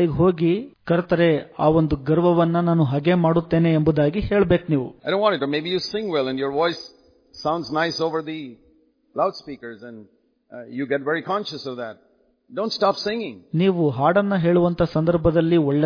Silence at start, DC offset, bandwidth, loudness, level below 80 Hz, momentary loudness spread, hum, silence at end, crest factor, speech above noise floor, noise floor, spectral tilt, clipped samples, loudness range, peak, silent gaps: 0 s; under 0.1%; 5.2 kHz; -21 LUFS; -46 dBFS; 15 LU; none; 0 s; 16 dB; 39 dB; -59 dBFS; -7.5 dB/octave; under 0.1%; 9 LU; -4 dBFS; none